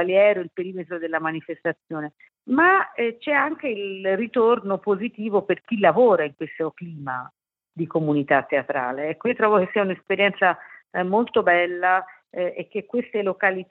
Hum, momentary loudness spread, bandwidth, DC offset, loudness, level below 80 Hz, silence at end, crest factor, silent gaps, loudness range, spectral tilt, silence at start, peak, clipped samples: none; 13 LU; 4.3 kHz; under 0.1%; -22 LUFS; -74 dBFS; 0.05 s; 18 dB; none; 2 LU; -9 dB/octave; 0 s; -4 dBFS; under 0.1%